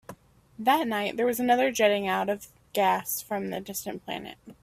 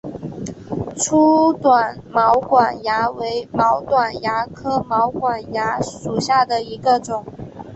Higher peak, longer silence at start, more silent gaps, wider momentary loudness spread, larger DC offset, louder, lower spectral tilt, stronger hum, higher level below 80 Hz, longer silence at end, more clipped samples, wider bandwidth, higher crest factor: second, -8 dBFS vs -2 dBFS; about the same, 0.1 s vs 0.05 s; neither; about the same, 12 LU vs 13 LU; neither; second, -27 LUFS vs -18 LUFS; about the same, -3.5 dB/octave vs -4.5 dB/octave; neither; second, -66 dBFS vs -50 dBFS; about the same, 0.1 s vs 0 s; neither; first, 16 kHz vs 8.4 kHz; about the same, 20 dB vs 16 dB